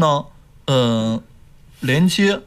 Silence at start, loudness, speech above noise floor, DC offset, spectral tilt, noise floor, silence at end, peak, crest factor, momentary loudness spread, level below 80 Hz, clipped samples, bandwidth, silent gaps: 0 s; -19 LUFS; 28 dB; under 0.1%; -5.5 dB/octave; -45 dBFS; 0.05 s; -6 dBFS; 14 dB; 13 LU; -48 dBFS; under 0.1%; 15 kHz; none